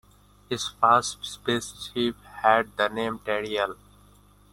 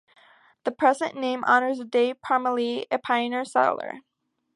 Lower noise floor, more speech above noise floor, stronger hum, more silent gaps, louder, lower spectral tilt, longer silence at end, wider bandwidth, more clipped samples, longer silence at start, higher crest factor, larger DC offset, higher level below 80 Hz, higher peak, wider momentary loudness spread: about the same, -56 dBFS vs -55 dBFS; about the same, 30 dB vs 31 dB; first, 50 Hz at -55 dBFS vs none; neither; about the same, -26 LUFS vs -24 LUFS; about the same, -3.5 dB/octave vs -3.5 dB/octave; first, 0.8 s vs 0.55 s; first, 16.5 kHz vs 11.5 kHz; neither; second, 0.5 s vs 0.65 s; about the same, 22 dB vs 20 dB; neither; first, -58 dBFS vs -76 dBFS; about the same, -4 dBFS vs -6 dBFS; about the same, 12 LU vs 12 LU